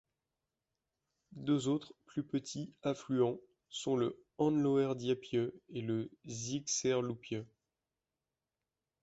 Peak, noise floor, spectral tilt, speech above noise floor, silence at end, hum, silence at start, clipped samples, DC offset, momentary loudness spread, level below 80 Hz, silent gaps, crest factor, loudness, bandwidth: -20 dBFS; under -90 dBFS; -5 dB/octave; over 54 dB; 1.55 s; none; 1.35 s; under 0.1%; under 0.1%; 12 LU; -74 dBFS; none; 18 dB; -36 LUFS; 8.2 kHz